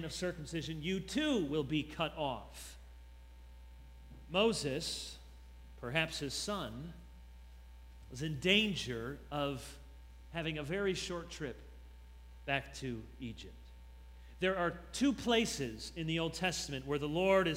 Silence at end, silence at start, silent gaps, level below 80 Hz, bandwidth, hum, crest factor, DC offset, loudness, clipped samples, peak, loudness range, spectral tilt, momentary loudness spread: 0 s; 0 s; none; -54 dBFS; 16 kHz; none; 24 dB; under 0.1%; -36 LUFS; under 0.1%; -14 dBFS; 5 LU; -4.5 dB/octave; 25 LU